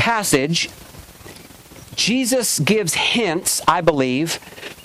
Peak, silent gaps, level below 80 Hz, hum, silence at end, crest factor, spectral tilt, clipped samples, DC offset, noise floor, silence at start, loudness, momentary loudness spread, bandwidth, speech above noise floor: -4 dBFS; none; -50 dBFS; none; 0 s; 16 dB; -3 dB/octave; under 0.1%; under 0.1%; -42 dBFS; 0 s; -18 LUFS; 14 LU; 16.5 kHz; 23 dB